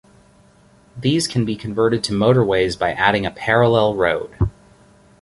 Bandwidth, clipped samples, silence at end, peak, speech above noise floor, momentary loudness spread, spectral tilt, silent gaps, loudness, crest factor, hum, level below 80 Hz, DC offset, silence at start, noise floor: 11.5 kHz; under 0.1%; 0.7 s; -2 dBFS; 34 dB; 8 LU; -5.5 dB/octave; none; -18 LUFS; 18 dB; none; -40 dBFS; under 0.1%; 0.95 s; -51 dBFS